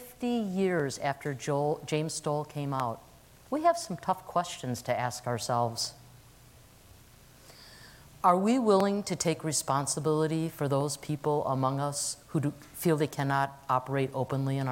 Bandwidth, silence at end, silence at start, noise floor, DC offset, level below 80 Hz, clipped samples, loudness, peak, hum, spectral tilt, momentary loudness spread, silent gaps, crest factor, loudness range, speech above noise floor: 17 kHz; 0 s; 0 s; -55 dBFS; under 0.1%; -64 dBFS; under 0.1%; -30 LUFS; -10 dBFS; none; -5 dB/octave; 8 LU; none; 20 dB; 6 LU; 26 dB